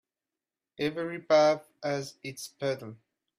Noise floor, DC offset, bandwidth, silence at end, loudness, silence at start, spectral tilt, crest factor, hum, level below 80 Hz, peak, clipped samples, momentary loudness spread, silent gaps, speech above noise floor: under -90 dBFS; under 0.1%; 14.5 kHz; 0.45 s; -29 LUFS; 0.8 s; -4.5 dB/octave; 20 dB; none; -76 dBFS; -12 dBFS; under 0.1%; 17 LU; none; over 61 dB